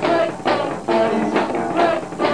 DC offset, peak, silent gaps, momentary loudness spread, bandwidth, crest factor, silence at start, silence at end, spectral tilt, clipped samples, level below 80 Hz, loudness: 0.5%; -4 dBFS; none; 3 LU; 10.5 kHz; 14 dB; 0 s; 0 s; -5.5 dB/octave; under 0.1%; -54 dBFS; -19 LUFS